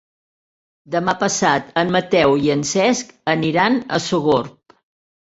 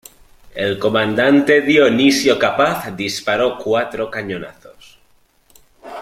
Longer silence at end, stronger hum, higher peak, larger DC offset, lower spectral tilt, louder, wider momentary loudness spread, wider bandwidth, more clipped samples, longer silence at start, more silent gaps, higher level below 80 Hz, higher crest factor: first, 0.8 s vs 0 s; neither; about the same, -2 dBFS vs -2 dBFS; neither; about the same, -4 dB/octave vs -4.5 dB/octave; about the same, -18 LUFS vs -16 LUFS; second, 6 LU vs 15 LU; second, 8.2 kHz vs 16 kHz; neither; first, 0.9 s vs 0.55 s; neither; about the same, -54 dBFS vs -54 dBFS; about the same, 18 dB vs 16 dB